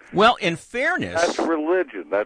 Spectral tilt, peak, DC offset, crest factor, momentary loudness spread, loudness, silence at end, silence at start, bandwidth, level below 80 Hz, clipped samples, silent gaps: -4 dB/octave; -4 dBFS; under 0.1%; 18 dB; 7 LU; -21 LUFS; 0 s; 0.1 s; 10.5 kHz; -54 dBFS; under 0.1%; none